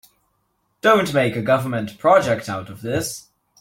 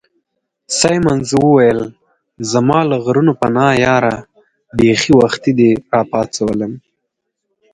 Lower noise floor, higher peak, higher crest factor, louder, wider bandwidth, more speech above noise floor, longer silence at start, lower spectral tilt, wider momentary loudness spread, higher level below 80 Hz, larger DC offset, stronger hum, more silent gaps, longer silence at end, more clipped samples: second, -69 dBFS vs -74 dBFS; about the same, -2 dBFS vs 0 dBFS; about the same, 18 dB vs 14 dB; second, -19 LUFS vs -13 LUFS; first, 16.5 kHz vs 11 kHz; second, 50 dB vs 61 dB; first, 0.85 s vs 0.7 s; about the same, -5 dB/octave vs -5 dB/octave; about the same, 13 LU vs 11 LU; second, -56 dBFS vs -46 dBFS; neither; neither; neither; second, 0.4 s vs 0.95 s; neither